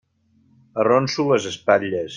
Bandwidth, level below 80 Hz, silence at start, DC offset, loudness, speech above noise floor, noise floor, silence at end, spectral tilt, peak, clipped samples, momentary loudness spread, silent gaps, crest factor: 9.6 kHz; -64 dBFS; 0.75 s; under 0.1%; -20 LUFS; 41 dB; -60 dBFS; 0 s; -5 dB/octave; -2 dBFS; under 0.1%; 4 LU; none; 18 dB